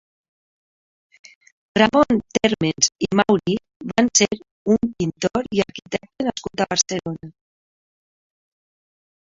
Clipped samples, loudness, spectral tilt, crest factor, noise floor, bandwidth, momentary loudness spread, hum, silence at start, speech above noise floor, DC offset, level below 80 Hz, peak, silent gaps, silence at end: under 0.1%; -20 LUFS; -3.5 dB/octave; 22 dB; under -90 dBFS; 7.8 kHz; 11 LU; none; 1.75 s; over 70 dB; under 0.1%; -54 dBFS; 0 dBFS; 3.76-3.80 s, 4.51-4.65 s; 1.9 s